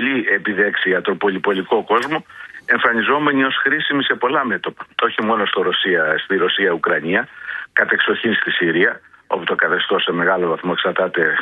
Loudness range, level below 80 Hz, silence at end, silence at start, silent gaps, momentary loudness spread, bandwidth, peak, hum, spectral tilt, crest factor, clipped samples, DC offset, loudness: 1 LU; -62 dBFS; 0 s; 0 s; none; 6 LU; 8.8 kHz; 0 dBFS; none; -6 dB/octave; 18 dB; under 0.1%; under 0.1%; -17 LUFS